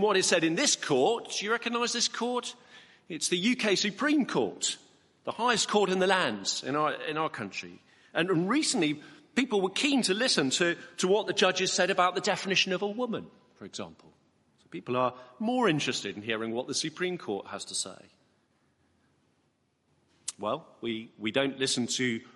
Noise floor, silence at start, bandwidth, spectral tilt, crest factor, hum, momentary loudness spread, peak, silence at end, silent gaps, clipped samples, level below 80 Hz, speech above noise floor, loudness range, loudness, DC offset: -73 dBFS; 0 s; 11.5 kHz; -3 dB/octave; 22 dB; none; 13 LU; -8 dBFS; 0.15 s; none; under 0.1%; -76 dBFS; 44 dB; 10 LU; -28 LUFS; under 0.1%